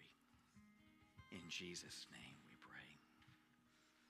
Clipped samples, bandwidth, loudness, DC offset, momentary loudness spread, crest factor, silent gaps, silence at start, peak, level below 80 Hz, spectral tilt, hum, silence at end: under 0.1%; 14.5 kHz; -55 LUFS; under 0.1%; 19 LU; 22 dB; none; 0 s; -38 dBFS; -82 dBFS; -2.5 dB/octave; none; 0 s